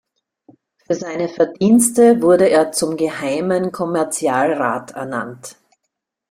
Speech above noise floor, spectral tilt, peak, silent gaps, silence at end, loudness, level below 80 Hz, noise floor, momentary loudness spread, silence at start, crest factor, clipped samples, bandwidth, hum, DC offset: 60 dB; -4.5 dB/octave; 0 dBFS; none; 0.8 s; -17 LUFS; -60 dBFS; -76 dBFS; 13 LU; 0.9 s; 18 dB; under 0.1%; 16 kHz; none; under 0.1%